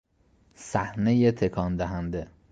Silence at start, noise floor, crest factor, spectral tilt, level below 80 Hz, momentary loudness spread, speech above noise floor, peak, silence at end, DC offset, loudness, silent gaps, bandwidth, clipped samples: 0.6 s; -63 dBFS; 18 dB; -7.5 dB/octave; -46 dBFS; 12 LU; 38 dB; -10 dBFS; 0.25 s; under 0.1%; -27 LUFS; none; 9.2 kHz; under 0.1%